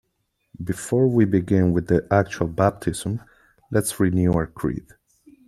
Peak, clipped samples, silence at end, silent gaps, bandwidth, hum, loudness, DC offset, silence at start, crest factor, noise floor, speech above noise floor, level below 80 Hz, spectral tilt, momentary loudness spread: -4 dBFS; under 0.1%; 0.65 s; none; 14.5 kHz; none; -22 LUFS; under 0.1%; 0.6 s; 20 dB; -73 dBFS; 52 dB; -46 dBFS; -7 dB/octave; 11 LU